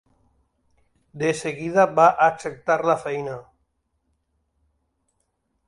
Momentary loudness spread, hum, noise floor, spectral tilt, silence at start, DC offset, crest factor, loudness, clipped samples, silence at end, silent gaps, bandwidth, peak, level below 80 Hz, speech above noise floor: 14 LU; none; -73 dBFS; -5.5 dB/octave; 1.15 s; under 0.1%; 22 dB; -21 LUFS; under 0.1%; 2.25 s; none; 11.5 kHz; -4 dBFS; -64 dBFS; 52 dB